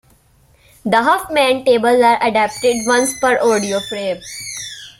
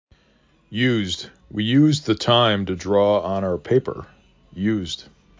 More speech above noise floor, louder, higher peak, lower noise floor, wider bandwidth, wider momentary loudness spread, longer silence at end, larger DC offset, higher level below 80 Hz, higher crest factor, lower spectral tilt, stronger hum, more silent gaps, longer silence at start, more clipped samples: about the same, 37 dB vs 39 dB; first, -15 LUFS vs -20 LUFS; about the same, -2 dBFS vs -2 dBFS; second, -52 dBFS vs -59 dBFS; first, 16.5 kHz vs 7.6 kHz; about the same, 13 LU vs 15 LU; second, 0.1 s vs 0.35 s; neither; about the same, -52 dBFS vs -48 dBFS; about the same, 14 dB vs 18 dB; second, -3 dB/octave vs -6 dB/octave; neither; neither; first, 0.85 s vs 0.7 s; neither